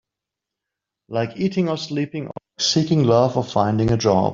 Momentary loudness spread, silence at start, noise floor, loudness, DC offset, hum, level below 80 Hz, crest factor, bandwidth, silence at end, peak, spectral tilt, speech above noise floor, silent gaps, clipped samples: 11 LU; 1.1 s; -85 dBFS; -20 LUFS; under 0.1%; none; -50 dBFS; 18 dB; 7.6 kHz; 0 s; -4 dBFS; -5.5 dB/octave; 66 dB; none; under 0.1%